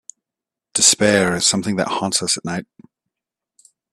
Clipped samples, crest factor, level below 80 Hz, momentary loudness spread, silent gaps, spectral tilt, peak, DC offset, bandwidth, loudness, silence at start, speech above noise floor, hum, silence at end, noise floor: under 0.1%; 20 dB; -58 dBFS; 12 LU; none; -2.5 dB/octave; 0 dBFS; under 0.1%; 14 kHz; -16 LUFS; 0.75 s; 69 dB; none; 1.3 s; -87 dBFS